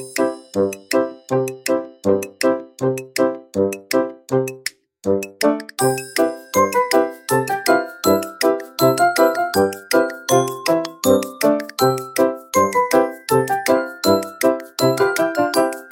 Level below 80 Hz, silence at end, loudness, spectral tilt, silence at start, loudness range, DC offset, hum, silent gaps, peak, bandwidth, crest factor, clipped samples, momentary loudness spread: -62 dBFS; 0.05 s; -19 LUFS; -4.5 dB/octave; 0 s; 4 LU; under 0.1%; none; none; -2 dBFS; 17 kHz; 16 dB; under 0.1%; 5 LU